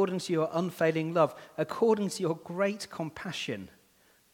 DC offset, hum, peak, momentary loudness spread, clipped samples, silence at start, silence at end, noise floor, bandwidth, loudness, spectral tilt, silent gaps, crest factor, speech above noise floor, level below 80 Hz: under 0.1%; none; -12 dBFS; 10 LU; under 0.1%; 0 s; 0.65 s; -65 dBFS; 18.5 kHz; -30 LUFS; -5.5 dB/octave; none; 20 dB; 35 dB; -72 dBFS